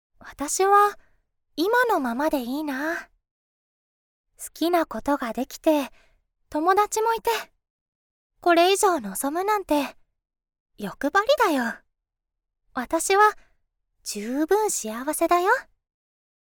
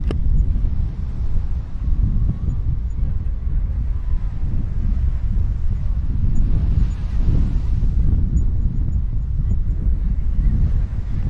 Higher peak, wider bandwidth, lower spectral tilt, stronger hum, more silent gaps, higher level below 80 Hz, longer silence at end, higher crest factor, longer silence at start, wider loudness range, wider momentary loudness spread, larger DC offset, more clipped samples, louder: about the same, -6 dBFS vs -6 dBFS; first, over 20 kHz vs 3.2 kHz; second, -2.5 dB/octave vs -9.5 dB/octave; neither; first, 3.31-4.24 s, 7.70-8.30 s, 10.60-10.66 s vs none; second, -58 dBFS vs -18 dBFS; first, 0.9 s vs 0 s; first, 20 dB vs 10 dB; first, 0.25 s vs 0 s; about the same, 4 LU vs 3 LU; first, 15 LU vs 5 LU; neither; neither; about the same, -23 LUFS vs -23 LUFS